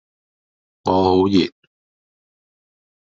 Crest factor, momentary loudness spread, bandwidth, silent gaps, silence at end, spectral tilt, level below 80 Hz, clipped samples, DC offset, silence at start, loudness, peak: 20 dB; 11 LU; 7.6 kHz; none; 1.5 s; -5.5 dB/octave; -62 dBFS; under 0.1%; under 0.1%; 0.85 s; -18 LUFS; -2 dBFS